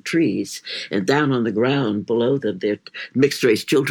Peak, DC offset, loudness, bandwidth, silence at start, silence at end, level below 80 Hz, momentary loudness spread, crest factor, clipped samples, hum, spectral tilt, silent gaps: -4 dBFS; under 0.1%; -20 LUFS; 18 kHz; 0.05 s; 0 s; -70 dBFS; 9 LU; 16 dB; under 0.1%; none; -5.5 dB/octave; none